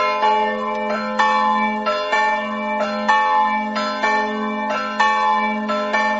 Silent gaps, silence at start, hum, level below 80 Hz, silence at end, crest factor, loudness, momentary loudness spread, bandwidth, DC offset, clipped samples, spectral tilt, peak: none; 0 s; none; -58 dBFS; 0 s; 16 dB; -19 LUFS; 6 LU; 8 kHz; under 0.1%; under 0.1%; -1.5 dB/octave; -2 dBFS